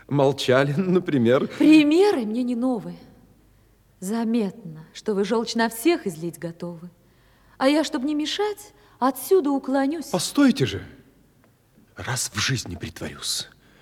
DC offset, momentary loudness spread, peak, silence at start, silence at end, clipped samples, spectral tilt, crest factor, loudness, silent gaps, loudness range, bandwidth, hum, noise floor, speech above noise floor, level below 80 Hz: under 0.1%; 15 LU; -4 dBFS; 0.1 s; 0.35 s; under 0.1%; -5 dB/octave; 18 dB; -22 LUFS; none; 7 LU; 16.5 kHz; none; -58 dBFS; 36 dB; -60 dBFS